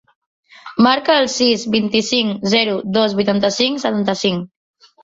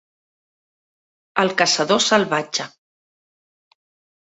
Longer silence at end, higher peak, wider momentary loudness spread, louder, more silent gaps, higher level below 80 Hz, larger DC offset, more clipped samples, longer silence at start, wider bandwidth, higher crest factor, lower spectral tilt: second, 0.6 s vs 1.55 s; about the same, -2 dBFS vs 0 dBFS; second, 5 LU vs 10 LU; about the same, -16 LUFS vs -18 LUFS; neither; first, -56 dBFS vs -68 dBFS; neither; neither; second, 0.65 s vs 1.35 s; about the same, 7.8 kHz vs 8.4 kHz; second, 16 dB vs 22 dB; first, -4 dB/octave vs -2.5 dB/octave